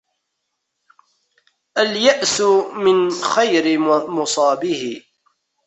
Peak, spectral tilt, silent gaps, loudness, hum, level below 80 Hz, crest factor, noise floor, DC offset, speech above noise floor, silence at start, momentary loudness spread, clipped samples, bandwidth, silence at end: -2 dBFS; -3 dB/octave; none; -17 LUFS; none; -66 dBFS; 18 dB; -75 dBFS; under 0.1%; 59 dB; 1.75 s; 9 LU; under 0.1%; 8.4 kHz; 0.65 s